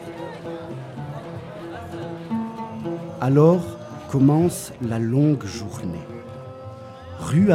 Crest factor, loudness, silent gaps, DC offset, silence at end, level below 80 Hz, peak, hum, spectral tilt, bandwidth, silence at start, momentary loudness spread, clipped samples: 18 dB; -23 LUFS; none; under 0.1%; 0 s; -54 dBFS; -4 dBFS; none; -7.5 dB/octave; 15.5 kHz; 0 s; 19 LU; under 0.1%